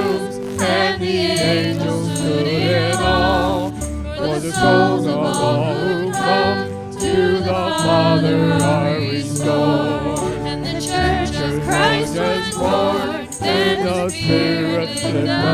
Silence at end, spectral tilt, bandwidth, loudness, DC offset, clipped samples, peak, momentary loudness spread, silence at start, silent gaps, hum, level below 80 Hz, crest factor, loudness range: 0 s; -5 dB/octave; 16 kHz; -18 LUFS; under 0.1%; under 0.1%; -2 dBFS; 7 LU; 0 s; none; none; -36 dBFS; 16 dB; 2 LU